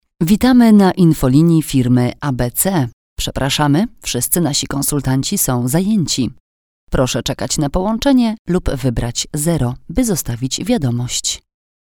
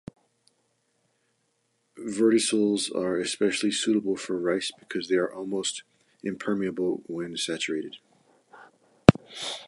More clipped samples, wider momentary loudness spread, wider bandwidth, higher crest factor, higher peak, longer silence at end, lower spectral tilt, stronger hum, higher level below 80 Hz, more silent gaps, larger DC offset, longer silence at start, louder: neither; second, 8 LU vs 14 LU; first, over 20 kHz vs 11.5 kHz; second, 16 dB vs 28 dB; about the same, 0 dBFS vs 0 dBFS; first, 0.5 s vs 0 s; about the same, -5 dB/octave vs -4.5 dB/octave; neither; first, -32 dBFS vs -52 dBFS; first, 2.93-3.16 s, 6.40-6.87 s, 8.39-8.45 s vs none; neither; second, 0.2 s vs 1.95 s; first, -16 LUFS vs -26 LUFS